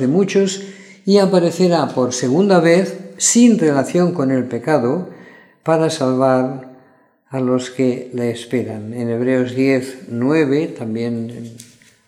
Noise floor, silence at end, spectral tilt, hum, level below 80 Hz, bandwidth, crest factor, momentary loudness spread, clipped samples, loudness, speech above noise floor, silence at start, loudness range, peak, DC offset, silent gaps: -53 dBFS; 0.45 s; -5.5 dB/octave; none; -68 dBFS; 13.5 kHz; 16 dB; 14 LU; under 0.1%; -17 LUFS; 37 dB; 0 s; 5 LU; 0 dBFS; under 0.1%; none